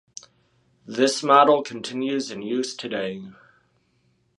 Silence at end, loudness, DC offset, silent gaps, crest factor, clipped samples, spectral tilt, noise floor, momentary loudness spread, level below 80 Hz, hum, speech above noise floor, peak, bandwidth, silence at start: 1.05 s; -22 LUFS; under 0.1%; none; 22 dB; under 0.1%; -3.5 dB/octave; -66 dBFS; 19 LU; -74 dBFS; none; 44 dB; -2 dBFS; 11.5 kHz; 0.9 s